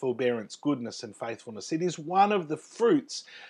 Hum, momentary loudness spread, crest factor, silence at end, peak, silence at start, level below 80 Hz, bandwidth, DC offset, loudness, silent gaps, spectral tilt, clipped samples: none; 13 LU; 18 dB; 0 s; -12 dBFS; 0 s; -86 dBFS; 11 kHz; under 0.1%; -29 LUFS; none; -5 dB/octave; under 0.1%